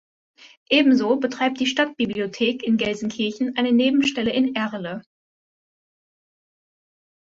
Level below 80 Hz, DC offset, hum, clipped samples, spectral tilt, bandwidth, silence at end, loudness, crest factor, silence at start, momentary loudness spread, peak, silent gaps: -62 dBFS; under 0.1%; none; under 0.1%; -4.5 dB/octave; 7.8 kHz; 2.3 s; -21 LUFS; 20 dB; 0.45 s; 8 LU; -4 dBFS; 0.57-0.66 s